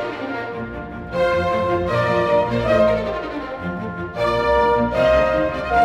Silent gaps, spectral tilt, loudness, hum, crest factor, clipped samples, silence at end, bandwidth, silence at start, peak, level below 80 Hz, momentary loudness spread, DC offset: none; -7 dB/octave; -20 LUFS; none; 14 dB; under 0.1%; 0 s; 11.5 kHz; 0 s; -4 dBFS; -38 dBFS; 11 LU; under 0.1%